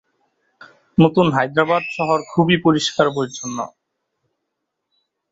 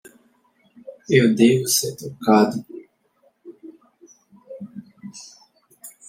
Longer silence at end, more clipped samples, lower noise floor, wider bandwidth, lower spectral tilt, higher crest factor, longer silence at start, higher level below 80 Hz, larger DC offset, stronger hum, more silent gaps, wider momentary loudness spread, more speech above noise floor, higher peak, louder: first, 1.65 s vs 0.2 s; neither; first, -77 dBFS vs -63 dBFS; second, 8 kHz vs 16.5 kHz; about the same, -5.5 dB/octave vs -4.5 dB/octave; about the same, 18 dB vs 20 dB; first, 1 s vs 0.85 s; first, -56 dBFS vs -68 dBFS; neither; neither; neither; second, 12 LU vs 27 LU; first, 60 dB vs 45 dB; about the same, -2 dBFS vs -2 dBFS; about the same, -18 LUFS vs -18 LUFS